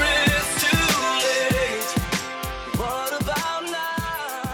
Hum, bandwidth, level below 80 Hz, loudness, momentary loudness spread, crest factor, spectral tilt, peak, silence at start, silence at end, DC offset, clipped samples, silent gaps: none; over 20 kHz; -38 dBFS; -22 LUFS; 9 LU; 14 dB; -3 dB/octave; -10 dBFS; 0 s; 0 s; under 0.1%; under 0.1%; none